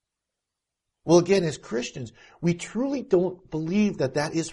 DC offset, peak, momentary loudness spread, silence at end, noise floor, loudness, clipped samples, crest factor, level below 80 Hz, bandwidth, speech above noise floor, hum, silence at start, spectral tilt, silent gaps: under 0.1%; -6 dBFS; 13 LU; 0 s; -85 dBFS; -25 LUFS; under 0.1%; 20 dB; -60 dBFS; 11.5 kHz; 61 dB; none; 1.05 s; -6 dB/octave; none